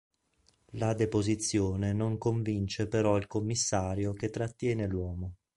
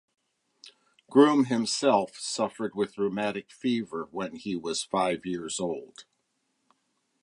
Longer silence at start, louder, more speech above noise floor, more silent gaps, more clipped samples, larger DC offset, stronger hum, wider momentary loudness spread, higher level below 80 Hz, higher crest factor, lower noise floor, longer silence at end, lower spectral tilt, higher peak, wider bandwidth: about the same, 0.75 s vs 0.65 s; second, -31 LUFS vs -28 LUFS; second, 40 dB vs 49 dB; neither; neither; neither; neither; second, 6 LU vs 13 LU; first, -50 dBFS vs -70 dBFS; about the same, 18 dB vs 22 dB; second, -70 dBFS vs -76 dBFS; second, 0.2 s vs 1.2 s; about the same, -5.5 dB/octave vs -4.5 dB/octave; second, -12 dBFS vs -6 dBFS; about the same, 11.5 kHz vs 11.5 kHz